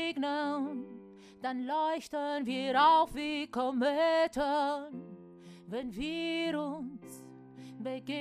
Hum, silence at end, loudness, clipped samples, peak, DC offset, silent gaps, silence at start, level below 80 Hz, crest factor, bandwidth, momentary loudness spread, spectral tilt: none; 0 s; -32 LUFS; under 0.1%; -14 dBFS; under 0.1%; none; 0 s; -64 dBFS; 18 dB; 14.5 kHz; 23 LU; -4.5 dB/octave